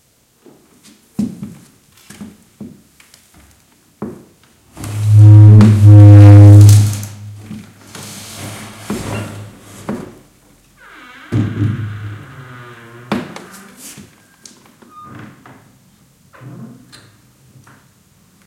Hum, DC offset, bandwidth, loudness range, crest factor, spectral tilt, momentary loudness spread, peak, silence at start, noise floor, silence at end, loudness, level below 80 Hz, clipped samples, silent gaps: none; under 0.1%; 12.5 kHz; 25 LU; 12 dB; -8 dB/octave; 30 LU; 0 dBFS; 1.2 s; -51 dBFS; 5.2 s; -7 LUFS; -46 dBFS; 1%; none